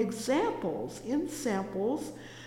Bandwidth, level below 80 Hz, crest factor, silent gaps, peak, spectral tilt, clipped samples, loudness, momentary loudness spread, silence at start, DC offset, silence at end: 17 kHz; -62 dBFS; 16 dB; none; -16 dBFS; -5 dB/octave; under 0.1%; -32 LUFS; 7 LU; 0 s; under 0.1%; 0 s